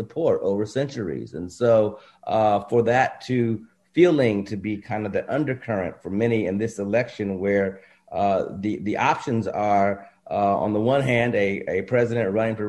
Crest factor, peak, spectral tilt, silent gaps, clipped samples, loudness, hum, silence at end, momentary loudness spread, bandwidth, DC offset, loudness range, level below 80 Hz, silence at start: 18 dB; -4 dBFS; -7 dB/octave; none; under 0.1%; -23 LUFS; none; 0 s; 9 LU; 11.5 kHz; under 0.1%; 3 LU; -54 dBFS; 0 s